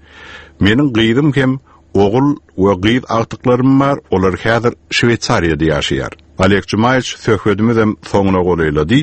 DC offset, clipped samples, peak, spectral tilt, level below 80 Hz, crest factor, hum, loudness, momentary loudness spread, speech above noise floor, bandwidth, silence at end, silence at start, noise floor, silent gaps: under 0.1%; under 0.1%; 0 dBFS; -6 dB/octave; -36 dBFS; 14 dB; none; -14 LUFS; 5 LU; 23 dB; 8.8 kHz; 0 s; 0.15 s; -36 dBFS; none